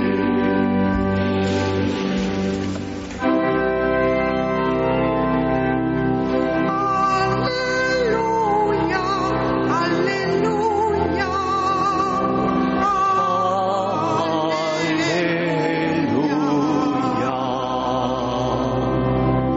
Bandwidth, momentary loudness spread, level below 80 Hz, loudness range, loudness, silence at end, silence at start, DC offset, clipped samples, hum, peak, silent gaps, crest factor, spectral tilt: 8 kHz; 3 LU; -40 dBFS; 1 LU; -20 LUFS; 0 s; 0 s; under 0.1%; under 0.1%; none; -8 dBFS; none; 12 dB; -5 dB/octave